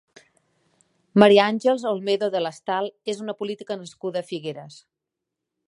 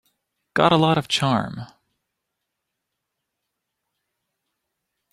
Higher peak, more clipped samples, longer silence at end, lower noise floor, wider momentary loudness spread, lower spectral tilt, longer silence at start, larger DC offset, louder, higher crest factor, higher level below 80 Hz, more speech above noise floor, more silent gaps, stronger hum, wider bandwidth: about the same, 0 dBFS vs -2 dBFS; neither; second, 0.95 s vs 3.45 s; about the same, -84 dBFS vs -81 dBFS; about the same, 17 LU vs 15 LU; about the same, -5.5 dB/octave vs -5.5 dB/octave; first, 1.15 s vs 0.55 s; neither; about the same, -22 LUFS vs -20 LUFS; about the same, 24 dB vs 24 dB; second, -72 dBFS vs -60 dBFS; about the same, 62 dB vs 61 dB; neither; neither; second, 11 kHz vs 13.5 kHz